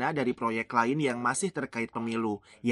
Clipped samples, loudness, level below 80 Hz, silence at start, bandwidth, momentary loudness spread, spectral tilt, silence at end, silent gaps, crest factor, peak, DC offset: under 0.1%; -30 LUFS; -68 dBFS; 0 s; 11.5 kHz; 6 LU; -5 dB/octave; 0 s; none; 20 dB; -10 dBFS; under 0.1%